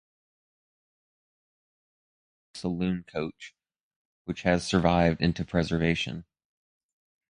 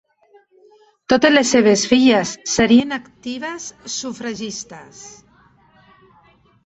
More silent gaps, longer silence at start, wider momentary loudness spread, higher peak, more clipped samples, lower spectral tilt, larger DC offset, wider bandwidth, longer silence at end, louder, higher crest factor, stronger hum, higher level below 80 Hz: first, 3.81-4.25 s vs none; first, 2.55 s vs 1.1 s; about the same, 20 LU vs 18 LU; second, -8 dBFS vs 0 dBFS; neither; first, -6 dB/octave vs -3.5 dB/octave; neither; first, 10.5 kHz vs 8.2 kHz; second, 1.05 s vs 1.55 s; second, -28 LUFS vs -17 LUFS; first, 24 dB vs 18 dB; neither; about the same, -48 dBFS vs -52 dBFS